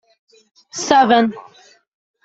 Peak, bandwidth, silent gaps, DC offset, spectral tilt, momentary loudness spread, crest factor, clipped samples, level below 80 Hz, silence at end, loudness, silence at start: 0 dBFS; 8 kHz; none; under 0.1%; -3.5 dB/octave; 20 LU; 20 dB; under 0.1%; -62 dBFS; 0.85 s; -15 LUFS; 0.75 s